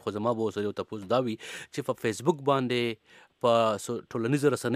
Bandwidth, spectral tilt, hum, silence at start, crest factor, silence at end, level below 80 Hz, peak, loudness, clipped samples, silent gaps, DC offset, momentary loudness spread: 15.5 kHz; -5.5 dB/octave; none; 0.05 s; 18 dB; 0 s; -72 dBFS; -10 dBFS; -29 LUFS; under 0.1%; none; under 0.1%; 10 LU